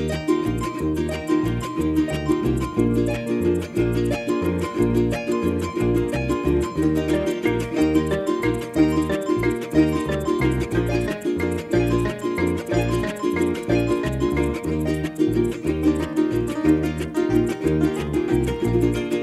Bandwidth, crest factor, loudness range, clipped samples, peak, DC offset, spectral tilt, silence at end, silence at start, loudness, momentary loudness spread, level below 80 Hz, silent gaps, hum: 13.5 kHz; 16 dB; 1 LU; under 0.1%; -6 dBFS; under 0.1%; -7 dB/octave; 0 s; 0 s; -22 LUFS; 4 LU; -36 dBFS; none; none